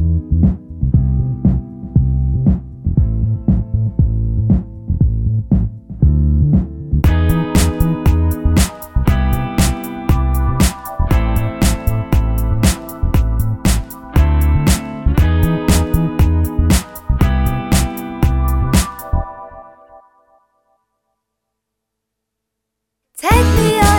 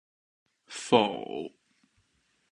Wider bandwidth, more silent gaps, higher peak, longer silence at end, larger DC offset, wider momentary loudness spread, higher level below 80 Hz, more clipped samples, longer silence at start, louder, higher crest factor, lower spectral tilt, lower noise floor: first, 19 kHz vs 11 kHz; neither; first, 0 dBFS vs -6 dBFS; second, 0 s vs 1.05 s; neither; second, 6 LU vs 19 LU; first, -18 dBFS vs -76 dBFS; neither; second, 0 s vs 0.7 s; first, -16 LUFS vs -28 LUFS; second, 14 dB vs 26 dB; first, -6 dB/octave vs -4 dB/octave; first, -77 dBFS vs -72 dBFS